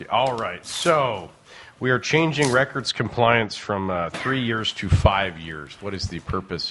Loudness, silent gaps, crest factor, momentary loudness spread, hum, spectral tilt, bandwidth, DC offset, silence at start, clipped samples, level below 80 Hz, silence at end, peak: -22 LUFS; none; 22 dB; 11 LU; none; -5 dB/octave; 11.5 kHz; under 0.1%; 0 s; under 0.1%; -40 dBFS; 0 s; -2 dBFS